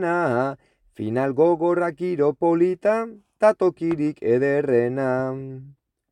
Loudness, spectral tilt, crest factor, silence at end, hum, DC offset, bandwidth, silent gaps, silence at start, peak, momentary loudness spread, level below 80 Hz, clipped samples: -22 LUFS; -8.5 dB/octave; 16 dB; 0.4 s; none; under 0.1%; 9.8 kHz; none; 0 s; -6 dBFS; 12 LU; -64 dBFS; under 0.1%